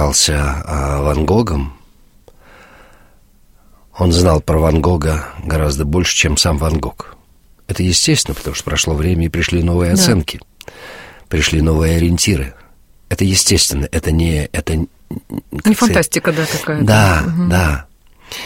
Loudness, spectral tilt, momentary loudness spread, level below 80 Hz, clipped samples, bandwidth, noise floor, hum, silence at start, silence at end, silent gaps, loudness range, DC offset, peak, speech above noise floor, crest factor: -15 LUFS; -4.5 dB/octave; 15 LU; -24 dBFS; under 0.1%; 16.5 kHz; -48 dBFS; none; 0 s; 0 s; none; 4 LU; under 0.1%; 0 dBFS; 33 dB; 16 dB